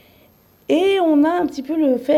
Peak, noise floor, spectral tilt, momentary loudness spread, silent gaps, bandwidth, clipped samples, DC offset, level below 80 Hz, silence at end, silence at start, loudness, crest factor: -6 dBFS; -53 dBFS; -5 dB/octave; 7 LU; none; 13.5 kHz; under 0.1%; under 0.1%; -60 dBFS; 0 s; 0.7 s; -18 LUFS; 12 dB